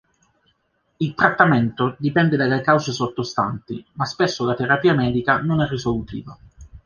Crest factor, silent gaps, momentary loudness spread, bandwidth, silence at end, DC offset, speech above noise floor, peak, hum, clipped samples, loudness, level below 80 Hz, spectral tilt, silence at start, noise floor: 18 dB; none; 11 LU; 7.2 kHz; 0.05 s; under 0.1%; 47 dB; -2 dBFS; none; under 0.1%; -20 LUFS; -48 dBFS; -6.5 dB/octave; 1 s; -67 dBFS